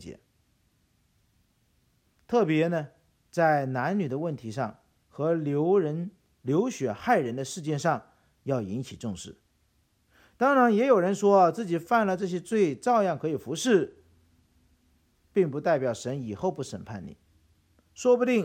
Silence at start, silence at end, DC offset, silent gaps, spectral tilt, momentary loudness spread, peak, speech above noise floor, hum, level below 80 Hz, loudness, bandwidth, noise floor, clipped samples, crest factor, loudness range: 0 s; 0 s; under 0.1%; none; -6 dB/octave; 15 LU; -10 dBFS; 43 dB; none; -68 dBFS; -27 LUFS; 15.5 kHz; -69 dBFS; under 0.1%; 18 dB; 7 LU